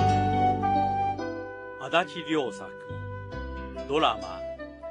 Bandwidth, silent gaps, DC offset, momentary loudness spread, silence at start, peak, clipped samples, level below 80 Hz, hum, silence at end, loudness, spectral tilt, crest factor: 10 kHz; none; under 0.1%; 14 LU; 0 s; -8 dBFS; under 0.1%; -46 dBFS; none; 0 s; -28 LUFS; -6 dB/octave; 20 dB